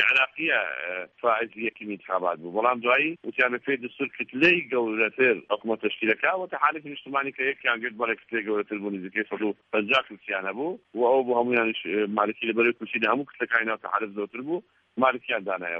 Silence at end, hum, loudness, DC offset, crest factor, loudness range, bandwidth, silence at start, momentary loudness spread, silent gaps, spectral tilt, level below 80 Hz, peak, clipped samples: 0 s; none; -26 LUFS; under 0.1%; 20 dB; 3 LU; 7.4 kHz; 0 s; 10 LU; none; -6 dB/octave; -74 dBFS; -6 dBFS; under 0.1%